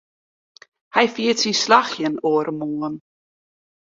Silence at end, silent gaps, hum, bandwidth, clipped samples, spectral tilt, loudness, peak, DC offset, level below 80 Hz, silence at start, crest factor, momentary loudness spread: 0.9 s; none; none; 7.8 kHz; under 0.1%; -3 dB/octave; -20 LUFS; -2 dBFS; under 0.1%; -68 dBFS; 0.95 s; 20 dB; 11 LU